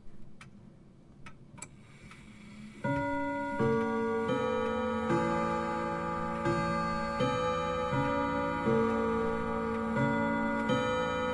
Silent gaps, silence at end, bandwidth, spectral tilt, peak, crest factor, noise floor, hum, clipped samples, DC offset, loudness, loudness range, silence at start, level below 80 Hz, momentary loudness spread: none; 0 s; 11.5 kHz; -6.5 dB/octave; -16 dBFS; 16 dB; -55 dBFS; none; under 0.1%; under 0.1%; -31 LUFS; 5 LU; 0 s; -54 dBFS; 18 LU